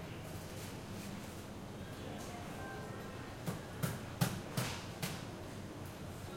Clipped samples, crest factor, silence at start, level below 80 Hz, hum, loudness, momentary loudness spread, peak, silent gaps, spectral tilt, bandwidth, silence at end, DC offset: under 0.1%; 24 dB; 0 s; -60 dBFS; none; -44 LUFS; 9 LU; -20 dBFS; none; -5 dB/octave; 16.5 kHz; 0 s; under 0.1%